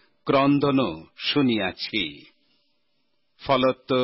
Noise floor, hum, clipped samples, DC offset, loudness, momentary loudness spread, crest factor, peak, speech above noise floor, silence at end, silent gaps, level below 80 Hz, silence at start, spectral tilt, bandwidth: -74 dBFS; none; under 0.1%; under 0.1%; -23 LUFS; 9 LU; 16 dB; -10 dBFS; 52 dB; 0 s; none; -58 dBFS; 0.25 s; -9.5 dB/octave; 5.8 kHz